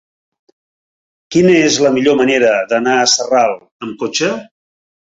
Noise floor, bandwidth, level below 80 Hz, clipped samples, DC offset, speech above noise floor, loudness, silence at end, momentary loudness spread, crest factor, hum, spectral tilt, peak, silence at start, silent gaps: under -90 dBFS; 8 kHz; -56 dBFS; under 0.1%; under 0.1%; over 77 dB; -13 LUFS; 0.6 s; 12 LU; 14 dB; none; -3.5 dB/octave; 0 dBFS; 1.3 s; 3.72-3.80 s